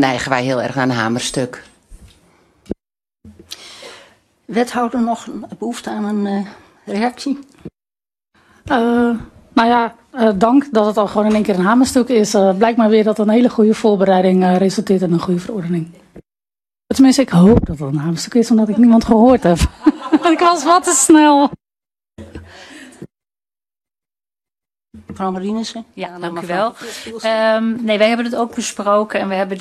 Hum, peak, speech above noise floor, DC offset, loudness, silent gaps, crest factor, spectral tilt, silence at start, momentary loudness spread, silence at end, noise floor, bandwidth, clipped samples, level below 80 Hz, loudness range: none; 0 dBFS; over 76 dB; under 0.1%; -15 LUFS; none; 16 dB; -5 dB/octave; 0 s; 15 LU; 0 s; under -90 dBFS; 13 kHz; under 0.1%; -38 dBFS; 12 LU